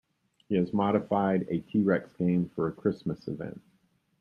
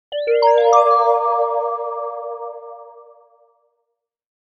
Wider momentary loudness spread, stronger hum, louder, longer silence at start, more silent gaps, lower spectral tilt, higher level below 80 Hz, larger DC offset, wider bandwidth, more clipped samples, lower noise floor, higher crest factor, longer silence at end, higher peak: second, 10 LU vs 19 LU; neither; second, -29 LUFS vs -16 LUFS; first, 0.5 s vs 0.1 s; neither; first, -10 dB/octave vs 1 dB/octave; first, -64 dBFS vs -76 dBFS; neither; second, 5.6 kHz vs 7.2 kHz; neither; second, -70 dBFS vs -76 dBFS; about the same, 18 dB vs 18 dB; second, 0.6 s vs 1.4 s; second, -12 dBFS vs 0 dBFS